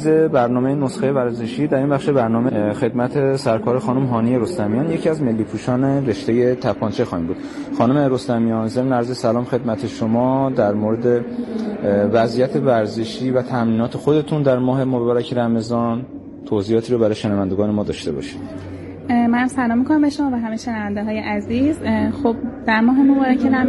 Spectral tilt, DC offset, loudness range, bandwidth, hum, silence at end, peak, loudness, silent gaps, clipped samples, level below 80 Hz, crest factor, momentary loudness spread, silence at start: -7.5 dB/octave; under 0.1%; 2 LU; 11.5 kHz; none; 0 s; -4 dBFS; -19 LUFS; none; under 0.1%; -50 dBFS; 14 dB; 7 LU; 0 s